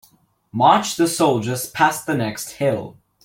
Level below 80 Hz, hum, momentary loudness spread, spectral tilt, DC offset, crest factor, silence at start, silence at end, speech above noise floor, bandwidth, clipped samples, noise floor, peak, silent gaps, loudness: -60 dBFS; none; 12 LU; -4.5 dB/octave; under 0.1%; 18 dB; 0.55 s; 0.3 s; 38 dB; 17 kHz; under 0.1%; -57 dBFS; -2 dBFS; none; -19 LUFS